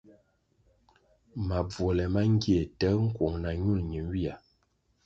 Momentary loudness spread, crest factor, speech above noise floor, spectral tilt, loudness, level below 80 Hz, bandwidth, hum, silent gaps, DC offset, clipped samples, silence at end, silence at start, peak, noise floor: 10 LU; 16 dB; 44 dB; -8 dB/octave; -29 LUFS; -42 dBFS; 7.8 kHz; none; none; under 0.1%; under 0.1%; 0.7 s; 1.35 s; -14 dBFS; -72 dBFS